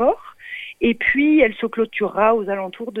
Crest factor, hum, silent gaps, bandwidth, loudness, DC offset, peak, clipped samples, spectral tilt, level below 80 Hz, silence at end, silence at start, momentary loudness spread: 16 dB; none; none; 4 kHz; -19 LUFS; under 0.1%; -2 dBFS; under 0.1%; -7 dB/octave; -48 dBFS; 0 s; 0 s; 15 LU